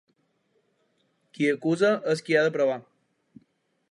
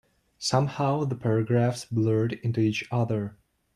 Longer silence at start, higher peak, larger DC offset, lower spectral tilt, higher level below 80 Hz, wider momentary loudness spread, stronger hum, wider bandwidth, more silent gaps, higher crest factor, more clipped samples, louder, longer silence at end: first, 1.4 s vs 0.4 s; about the same, -10 dBFS vs -8 dBFS; neither; about the same, -5.5 dB/octave vs -6.5 dB/octave; second, -80 dBFS vs -62 dBFS; about the same, 5 LU vs 4 LU; neither; about the same, 11.5 kHz vs 11.5 kHz; neither; about the same, 18 dB vs 18 dB; neither; about the same, -25 LUFS vs -26 LUFS; first, 1.1 s vs 0.4 s